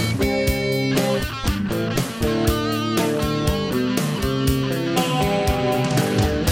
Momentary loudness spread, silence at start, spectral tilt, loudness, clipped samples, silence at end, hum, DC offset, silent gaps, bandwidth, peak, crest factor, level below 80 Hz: 3 LU; 0 s; -5.5 dB/octave; -21 LUFS; under 0.1%; 0 s; none; under 0.1%; none; 16.5 kHz; -6 dBFS; 16 dB; -32 dBFS